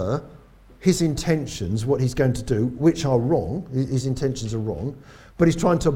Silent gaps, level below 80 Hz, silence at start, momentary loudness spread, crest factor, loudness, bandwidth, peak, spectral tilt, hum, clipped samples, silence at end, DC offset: none; -42 dBFS; 0 s; 8 LU; 16 dB; -23 LUFS; 16 kHz; -6 dBFS; -6.5 dB/octave; none; under 0.1%; 0 s; under 0.1%